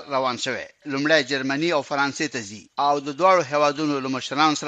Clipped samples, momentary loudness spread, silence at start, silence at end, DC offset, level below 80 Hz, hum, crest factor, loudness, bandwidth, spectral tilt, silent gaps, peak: under 0.1%; 9 LU; 0 s; 0 s; under 0.1%; -70 dBFS; none; 18 dB; -22 LUFS; 9.2 kHz; -3.5 dB/octave; none; -4 dBFS